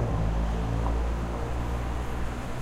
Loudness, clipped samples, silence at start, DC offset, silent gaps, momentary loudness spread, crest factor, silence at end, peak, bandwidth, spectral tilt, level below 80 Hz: -31 LUFS; under 0.1%; 0 s; under 0.1%; none; 5 LU; 14 dB; 0 s; -14 dBFS; 11 kHz; -7 dB/octave; -30 dBFS